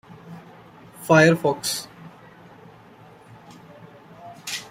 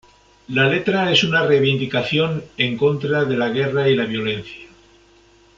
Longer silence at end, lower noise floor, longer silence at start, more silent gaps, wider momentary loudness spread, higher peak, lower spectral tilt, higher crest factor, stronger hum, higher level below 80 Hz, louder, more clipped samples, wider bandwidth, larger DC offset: second, 0.05 s vs 0.9 s; second, -48 dBFS vs -52 dBFS; second, 0.3 s vs 0.5 s; neither; first, 29 LU vs 8 LU; about the same, -2 dBFS vs -2 dBFS; about the same, -4.5 dB/octave vs -5.5 dB/octave; first, 24 dB vs 18 dB; neither; second, -64 dBFS vs -54 dBFS; about the same, -20 LUFS vs -18 LUFS; neither; first, 16 kHz vs 7.6 kHz; neither